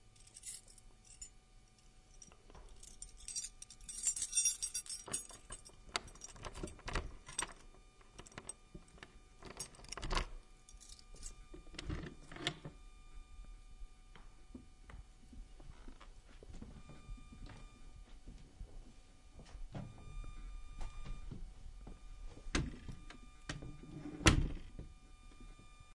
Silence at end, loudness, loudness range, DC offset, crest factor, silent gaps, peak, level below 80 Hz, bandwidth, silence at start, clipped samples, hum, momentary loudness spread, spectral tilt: 0 s; -42 LUFS; 18 LU; under 0.1%; 34 dB; none; -12 dBFS; -50 dBFS; 11.5 kHz; 0 s; under 0.1%; none; 21 LU; -2.5 dB/octave